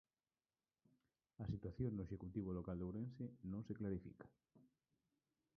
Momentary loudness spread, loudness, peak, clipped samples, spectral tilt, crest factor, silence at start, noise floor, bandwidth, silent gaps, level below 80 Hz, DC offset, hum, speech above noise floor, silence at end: 7 LU; -49 LUFS; -32 dBFS; under 0.1%; -10.5 dB/octave; 18 dB; 1.4 s; under -90 dBFS; 6 kHz; none; -66 dBFS; under 0.1%; none; over 42 dB; 0.95 s